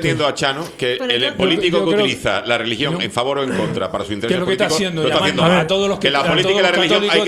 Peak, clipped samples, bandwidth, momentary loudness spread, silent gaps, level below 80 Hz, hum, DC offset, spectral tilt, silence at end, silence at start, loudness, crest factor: 0 dBFS; under 0.1%; 14.5 kHz; 6 LU; none; -48 dBFS; none; under 0.1%; -4.5 dB/octave; 0 s; 0 s; -17 LUFS; 16 dB